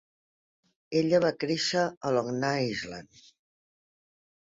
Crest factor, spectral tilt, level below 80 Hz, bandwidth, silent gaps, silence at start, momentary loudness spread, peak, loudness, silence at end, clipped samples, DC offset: 20 dB; -5 dB/octave; -68 dBFS; 7.8 kHz; 1.97-2.01 s; 0.9 s; 10 LU; -12 dBFS; -28 LUFS; 1.35 s; under 0.1%; under 0.1%